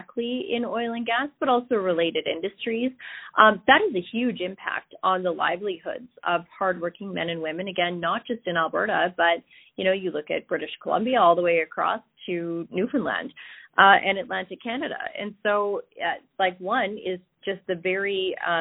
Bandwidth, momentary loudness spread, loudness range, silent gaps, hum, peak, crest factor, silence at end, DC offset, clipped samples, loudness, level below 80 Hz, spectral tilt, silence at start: 4.1 kHz; 12 LU; 5 LU; none; none; -2 dBFS; 22 dB; 0 s; under 0.1%; under 0.1%; -25 LUFS; -68 dBFS; -9 dB/octave; 0 s